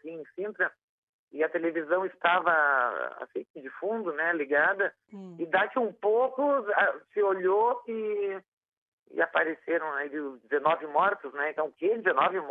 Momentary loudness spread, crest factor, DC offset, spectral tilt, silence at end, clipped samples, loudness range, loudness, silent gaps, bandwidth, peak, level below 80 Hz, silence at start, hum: 13 LU; 18 dB; under 0.1%; -7 dB/octave; 0 s; under 0.1%; 3 LU; -28 LUFS; 0.83-1.28 s, 3.50-3.54 s, 8.48-8.62 s, 8.68-9.06 s; 4 kHz; -10 dBFS; -88 dBFS; 0.05 s; none